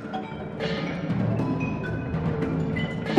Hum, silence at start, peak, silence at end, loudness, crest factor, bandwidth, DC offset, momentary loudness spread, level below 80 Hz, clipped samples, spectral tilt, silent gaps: none; 0 s; -6 dBFS; 0 s; -28 LUFS; 22 dB; 8.4 kHz; under 0.1%; 6 LU; -44 dBFS; under 0.1%; -8 dB/octave; none